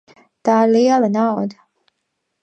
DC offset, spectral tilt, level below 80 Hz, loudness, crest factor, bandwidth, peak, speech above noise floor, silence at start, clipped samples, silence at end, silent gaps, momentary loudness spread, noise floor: under 0.1%; -6.5 dB/octave; -72 dBFS; -16 LUFS; 16 dB; 8.2 kHz; -2 dBFS; 59 dB; 0.45 s; under 0.1%; 0.9 s; none; 11 LU; -74 dBFS